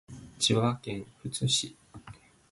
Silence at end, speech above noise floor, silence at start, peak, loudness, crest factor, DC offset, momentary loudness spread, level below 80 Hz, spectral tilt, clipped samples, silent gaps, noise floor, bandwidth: 0.4 s; 22 dB; 0.1 s; -12 dBFS; -29 LUFS; 20 dB; under 0.1%; 23 LU; -60 dBFS; -4 dB/octave; under 0.1%; none; -52 dBFS; 11.5 kHz